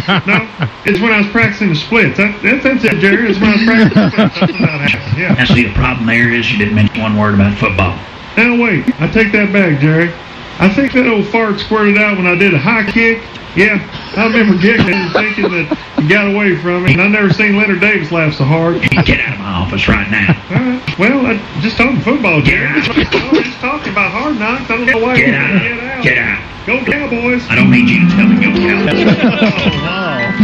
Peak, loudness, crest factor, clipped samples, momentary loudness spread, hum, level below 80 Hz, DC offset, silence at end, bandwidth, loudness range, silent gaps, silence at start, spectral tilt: 0 dBFS; -11 LUFS; 12 dB; under 0.1%; 6 LU; none; -32 dBFS; under 0.1%; 0 s; 8.2 kHz; 2 LU; none; 0 s; -7 dB/octave